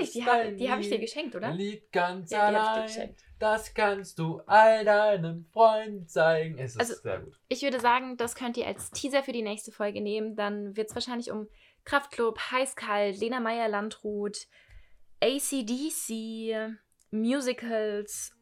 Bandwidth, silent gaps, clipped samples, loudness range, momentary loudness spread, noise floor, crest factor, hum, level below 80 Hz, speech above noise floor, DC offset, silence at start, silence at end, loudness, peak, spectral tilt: 16 kHz; none; under 0.1%; 8 LU; 12 LU; -52 dBFS; 22 dB; none; -64 dBFS; 24 dB; under 0.1%; 0 s; 0.15 s; -29 LUFS; -8 dBFS; -4 dB/octave